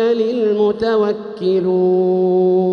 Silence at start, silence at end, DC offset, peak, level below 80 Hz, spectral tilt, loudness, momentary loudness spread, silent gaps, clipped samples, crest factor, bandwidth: 0 s; 0 s; under 0.1%; -6 dBFS; -56 dBFS; -8.5 dB/octave; -16 LUFS; 4 LU; none; under 0.1%; 8 dB; 6.2 kHz